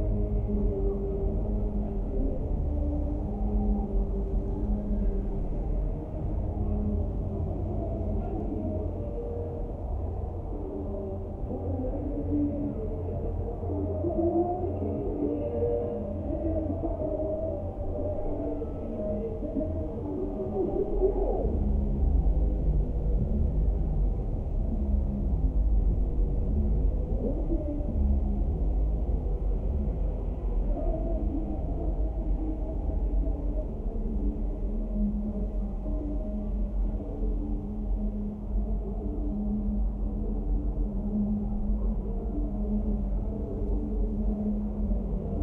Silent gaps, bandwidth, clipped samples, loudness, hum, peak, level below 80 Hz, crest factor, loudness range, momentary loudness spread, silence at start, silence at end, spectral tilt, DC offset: none; 2.2 kHz; under 0.1%; -31 LUFS; none; -14 dBFS; -30 dBFS; 14 dB; 4 LU; 5 LU; 0 s; 0 s; -12.5 dB/octave; under 0.1%